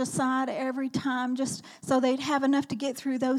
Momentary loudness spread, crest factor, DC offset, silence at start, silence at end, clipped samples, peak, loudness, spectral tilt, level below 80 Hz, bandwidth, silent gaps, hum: 6 LU; 14 dB; under 0.1%; 0 s; 0 s; under 0.1%; -14 dBFS; -28 LUFS; -4.5 dB/octave; -74 dBFS; 14.5 kHz; none; none